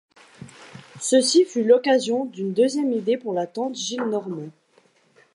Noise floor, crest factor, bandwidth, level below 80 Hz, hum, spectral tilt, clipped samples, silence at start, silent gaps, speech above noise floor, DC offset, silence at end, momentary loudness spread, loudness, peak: -60 dBFS; 18 dB; 11.5 kHz; -76 dBFS; none; -4 dB/octave; under 0.1%; 0.4 s; none; 39 dB; under 0.1%; 0.85 s; 13 LU; -21 LUFS; -6 dBFS